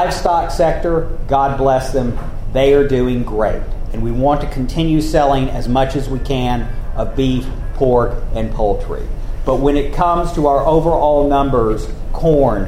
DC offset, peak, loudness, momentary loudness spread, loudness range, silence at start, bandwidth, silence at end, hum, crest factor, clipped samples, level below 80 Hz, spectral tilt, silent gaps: under 0.1%; 0 dBFS; -16 LUFS; 10 LU; 3 LU; 0 s; 14 kHz; 0 s; none; 14 dB; under 0.1%; -20 dBFS; -7 dB/octave; none